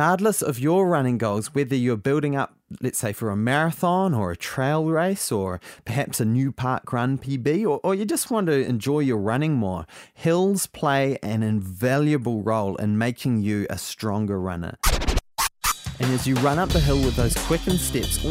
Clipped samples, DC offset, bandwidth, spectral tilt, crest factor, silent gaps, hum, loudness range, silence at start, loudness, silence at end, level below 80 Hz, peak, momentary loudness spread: under 0.1%; under 0.1%; 16 kHz; -5.5 dB/octave; 18 dB; none; none; 2 LU; 0 s; -23 LUFS; 0 s; -36 dBFS; -6 dBFS; 6 LU